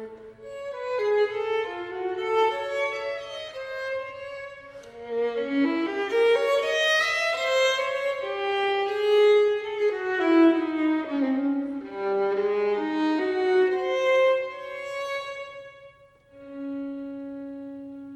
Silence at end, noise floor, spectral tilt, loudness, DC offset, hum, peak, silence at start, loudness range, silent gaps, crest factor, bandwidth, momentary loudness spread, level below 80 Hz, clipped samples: 0 s; -54 dBFS; -3.5 dB/octave; -25 LUFS; under 0.1%; none; -10 dBFS; 0 s; 7 LU; none; 16 dB; 13 kHz; 17 LU; -68 dBFS; under 0.1%